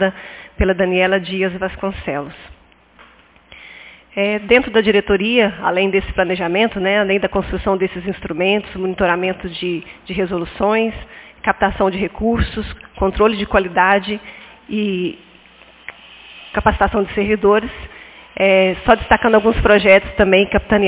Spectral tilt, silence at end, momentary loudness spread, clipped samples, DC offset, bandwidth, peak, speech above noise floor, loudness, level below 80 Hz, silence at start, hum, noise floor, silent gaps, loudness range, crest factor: -9.5 dB/octave; 0 s; 19 LU; under 0.1%; under 0.1%; 4 kHz; 0 dBFS; 32 dB; -16 LUFS; -32 dBFS; 0 s; none; -48 dBFS; none; 6 LU; 16 dB